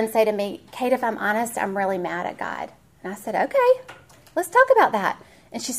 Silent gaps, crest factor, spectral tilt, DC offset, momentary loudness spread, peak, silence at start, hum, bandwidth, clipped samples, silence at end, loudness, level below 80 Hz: none; 20 dB; -4 dB/octave; under 0.1%; 17 LU; -4 dBFS; 0 s; none; 15.5 kHz; under 0.1%; 0 s; -22 LUFS; -64 dBFS